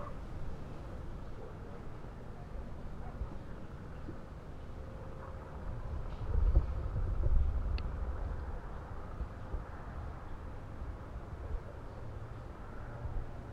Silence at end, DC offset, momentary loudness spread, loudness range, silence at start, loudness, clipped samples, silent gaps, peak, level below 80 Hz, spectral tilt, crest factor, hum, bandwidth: 0 s; under 0.1%; 13 LU; 10 LU; 0 s; -43 LUFS; under 0.1%; none; -16 dBFS; -40 dBFS; -8.5 dB/octave; 22 dB; none; 7 kHz